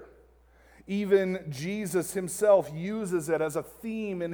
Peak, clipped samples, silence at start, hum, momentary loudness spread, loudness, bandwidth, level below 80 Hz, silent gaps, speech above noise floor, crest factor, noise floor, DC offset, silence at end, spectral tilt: -10 dBFS; under 0.1%; 0 s; none; 12 LU; -29 LUFS; over 20 kHz; -62 dBFS; none; 31 dB; 18 dB; -59 dBFS; under 0.1%; 0 s; -5.5 dB/octave